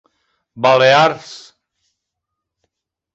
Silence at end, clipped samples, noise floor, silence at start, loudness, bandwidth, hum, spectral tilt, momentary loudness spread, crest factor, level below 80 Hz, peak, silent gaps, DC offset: 1.75 s; under 0.1%; -79 dBFS; 0.55 s; -12 LUFS; 8 kHz; none; -4 dB/octave; 20 LU; 18 dB; -62 dBFS; -2 dBFS; none; under 0.1%